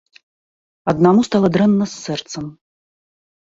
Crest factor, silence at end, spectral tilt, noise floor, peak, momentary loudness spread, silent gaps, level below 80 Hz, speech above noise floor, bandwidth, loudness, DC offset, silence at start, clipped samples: 18 dB; 1.05 s; -6.5 dB/octave; under -90 dBFS; -2 dBFS; 16 LU; none; -54 dBFS; over 74 dB; 7.8 kHz; -16 LUFS; under 0.1%; 0.85 s; under 0.1%